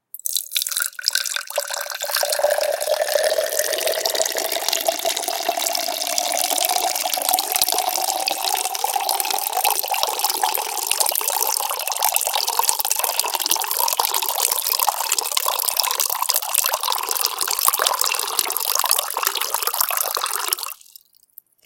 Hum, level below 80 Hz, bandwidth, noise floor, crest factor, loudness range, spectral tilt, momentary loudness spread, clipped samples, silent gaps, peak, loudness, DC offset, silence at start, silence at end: none; -70 dBFS; 19 kHz; -50 dBFS; 22 dB; 2 LU; 2.5 dB/octave; 4 LU; under 0.1%; none; 0 dBFS; -19 LUFS; under 0.1%; 0.15 s; 0.9 s